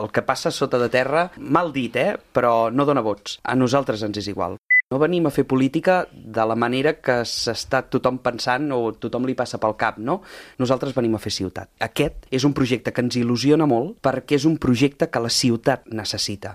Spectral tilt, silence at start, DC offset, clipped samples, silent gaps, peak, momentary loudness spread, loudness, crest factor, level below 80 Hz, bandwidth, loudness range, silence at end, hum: -5 dB/octave; 0 s; under 0.1%; under 0.1%; 4.58-4.64 s; 0 dBFS; 8 LU; -21 LUFS; 20 dB; -50 dBFS; 15.5 kHz; 3 LU; 0 s; none